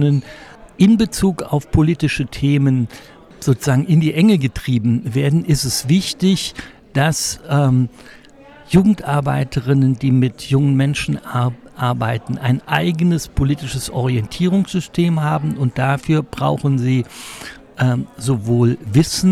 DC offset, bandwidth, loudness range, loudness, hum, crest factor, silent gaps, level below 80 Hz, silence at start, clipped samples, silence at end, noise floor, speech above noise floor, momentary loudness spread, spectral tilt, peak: under 0.1%; 16 kHz; 2 LU; -17 LUFS; none; 16 dB; none; -38 dBFS; 0 s; under 0.1%; 0 s; -42 dBFS; 26 dB; 7 LU; -6 dB/octave; -2 dBFS